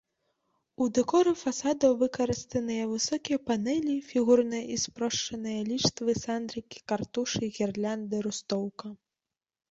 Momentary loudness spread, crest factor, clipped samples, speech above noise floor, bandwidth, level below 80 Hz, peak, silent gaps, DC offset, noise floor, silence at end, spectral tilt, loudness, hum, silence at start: 9 LU; 20 dB; under 0.1%; over 61 dB; 8 kHz; -62 dBFS; -10 dBFS; none; under 0.1%; under -90 dBFS; 0.75 s; -4 dB/octave; -29 LUFS; none; 0.8 s